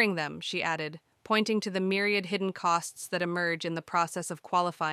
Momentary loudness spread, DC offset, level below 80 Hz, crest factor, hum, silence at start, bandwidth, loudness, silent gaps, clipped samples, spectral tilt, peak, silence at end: 6 LU; under 0.1%; -76 dBFS; 18 dB; none; 0 s; 15 kHz; -30 LUFS; none; under 0.1%; -4 dB/octave; -12 dBFS; 0 s